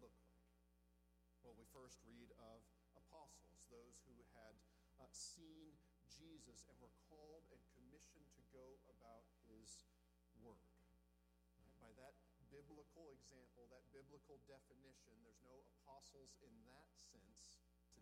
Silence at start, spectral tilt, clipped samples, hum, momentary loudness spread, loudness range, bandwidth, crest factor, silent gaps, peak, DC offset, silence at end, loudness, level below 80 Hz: 0 s; -3.5 dB/octave; under 0.1%; 60 Hz at -75 dBFS; 6 LU; 6 LU; 14.5 kHz; 24 dB; none; -44 dBFS; under 0.1%; 0 s; -66 LUFS; -78 dBFS